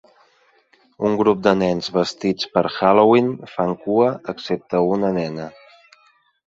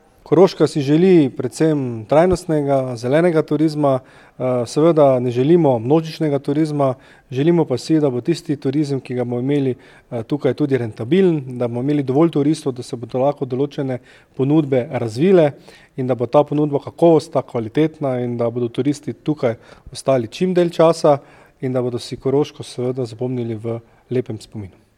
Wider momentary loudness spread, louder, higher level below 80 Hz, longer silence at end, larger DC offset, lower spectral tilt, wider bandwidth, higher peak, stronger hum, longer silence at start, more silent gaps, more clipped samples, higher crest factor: about the same, 11 LU vs 11 LU; about the same, -19 LUFS vs -18 LUFS; second, -58 dBFS vs -52 dBFS; first, 0.95 s vs 0.3 s; neither; about the same, -6.5 dB/octave vs -7.5 dB/octave; second, 7.8 kHz vs 12.5 kHz; about the same, -2 dBFS vs 0 dBFS; neither; first, 1 s vs 0.3 s; neither; neither; about the same, 18 dB vs 18 dB